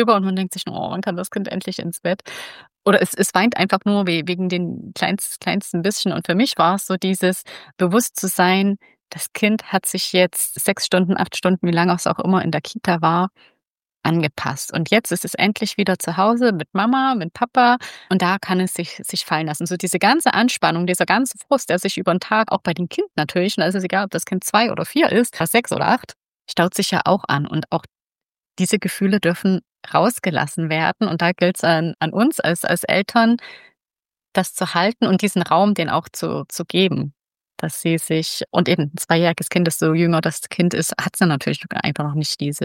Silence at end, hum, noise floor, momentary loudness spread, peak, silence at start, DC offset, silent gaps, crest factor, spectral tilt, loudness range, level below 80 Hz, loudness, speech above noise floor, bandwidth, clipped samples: 0 s; none; under -90 dBFS; 8 LU; -2 dBFS; 0 s; under 0.1%; 13.67-13.71 s, 26.16-26.21 s, 26.28-26.40 s, 34.28-34.32 s; 18 dB; -4.5 dB/octave; 2 LU; -64 dBFS; -19 LUFS; over 71 dB; 17 kHz; under 0.1%